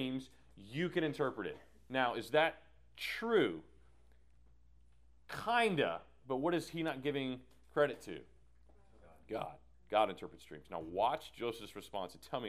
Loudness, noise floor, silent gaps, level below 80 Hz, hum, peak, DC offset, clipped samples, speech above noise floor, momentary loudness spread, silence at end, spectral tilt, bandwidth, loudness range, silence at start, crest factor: -37 LUFS; -67 dBFS; none; -68 dBFS; none; -16 dBFS; under 0.1%; under 0.1%; 30 dB; 16 LU; 0 s; -5.5 dB/octave; 15.5 kHz; 4 LU; 0 s; 22 dB